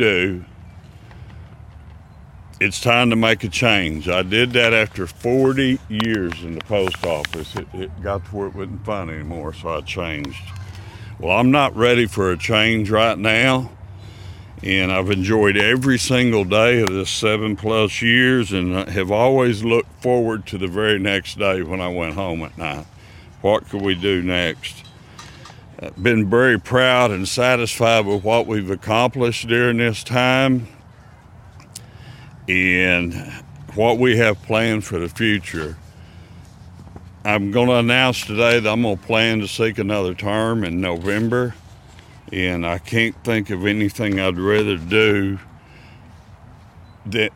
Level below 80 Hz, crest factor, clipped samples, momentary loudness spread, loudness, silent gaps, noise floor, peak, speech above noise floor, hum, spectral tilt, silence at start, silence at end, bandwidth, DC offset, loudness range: -44 dBFS; 18 dB; under 0.1%; 15 LU; -18 LUFS; none; -44 dBFS; 0 dBFS; 26 dB; none; -5 dB/octave; 0 s; 0.05 s; 17 kHz; under 0.1%; 6 LU